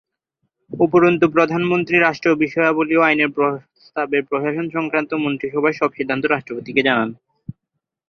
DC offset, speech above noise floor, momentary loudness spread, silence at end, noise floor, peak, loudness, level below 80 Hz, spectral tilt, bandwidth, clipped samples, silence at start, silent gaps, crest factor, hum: under 0.1%; 61 dB; 12 LU; 0.6 s; -79 dBFS; -2 dBFS; -18 LUFS; -60 dBFS; -7 dB/octave; 6.6 kHz; under 0.1%; 0.7 s; none; 18 dB; none